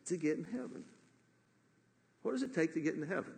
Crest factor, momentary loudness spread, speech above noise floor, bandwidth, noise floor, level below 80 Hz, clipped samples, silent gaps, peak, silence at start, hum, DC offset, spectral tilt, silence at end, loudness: 18 dB; 14 LU; 35 dB; 9.6 kHz; -72 dBFS; -86 dBFS; under 0.1%; none; -22 dBFS; 0.05 s; none; under 0.1%; -6 dB/octave; 0 s; -38 LUFS